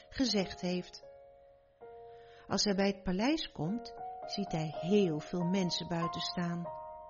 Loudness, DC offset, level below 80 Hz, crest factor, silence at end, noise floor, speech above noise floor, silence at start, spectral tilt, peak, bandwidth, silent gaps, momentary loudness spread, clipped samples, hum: -34 LUFS; under 0.1%; -58 dBFS; 18 dB; 0 s; -61 dBFS; 28 dB; 0.1 s; -4.5 dB/octave; -16 dBFS; 7.2 kHz; none; 21 LU; under 0.1%; none